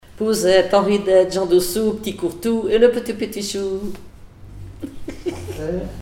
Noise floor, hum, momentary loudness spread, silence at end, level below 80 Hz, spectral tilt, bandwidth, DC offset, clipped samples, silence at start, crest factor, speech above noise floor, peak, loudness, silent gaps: -39 dBFS; none; 18 LU; 0 s; -42 dBFS; -4.5 dB/octave; 18 kHz; under 0.1%; under 0.1%; 0.1 s; 18 dB; 21 dB; -2 dBFS; -19 LUFS; none